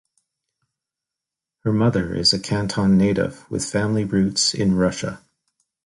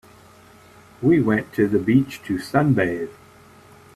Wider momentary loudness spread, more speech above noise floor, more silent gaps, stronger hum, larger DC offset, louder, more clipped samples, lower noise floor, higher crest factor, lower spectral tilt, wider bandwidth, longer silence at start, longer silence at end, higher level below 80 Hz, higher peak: about the same, 9 LU vs 10 LU; first, 67 dB vs 29 dB; neither; neither; neither; about the same, -20 LUFS vs -20 LUFS; neither; first, -86 dBFS vs -49 dBFS; about the same, 16 dB vs 18 dB; second, -5 dB/octave vs -8 dB/octave; second, 11.5 kHz vs 14.5 kHz; first, 1.65 s vs 1 s; second, 0.7 s vs 0.85 s; first, -46 dBFS vs -54 dBFS; about the same, -6 dBFS vs -4 dBFS